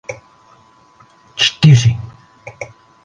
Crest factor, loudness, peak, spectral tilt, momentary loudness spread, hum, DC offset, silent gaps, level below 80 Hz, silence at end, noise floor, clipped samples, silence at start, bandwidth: 16 dB; -12 LUFS; 0 dBFS; -5 dB/octave; 24 LU; none; under 0.1%; none; -44 dBFS; 0.4 s; -48 dBFS; under 0.1%; 0.1 s; 9.4 kHz